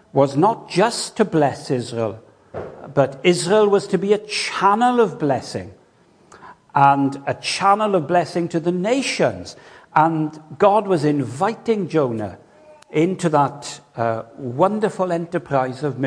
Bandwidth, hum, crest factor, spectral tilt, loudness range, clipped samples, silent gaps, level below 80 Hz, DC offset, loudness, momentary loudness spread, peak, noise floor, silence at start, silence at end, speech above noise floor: 10.5 kHz; none; 20 dB; -5.5 dB/octave; 3 LU; under 0.1%; none; -62 dBFS; under 0.1%; -19 LUFS; 12 LU; 0 dBFS; -54 dBFS; 0.15 s; 0 s; 35 dB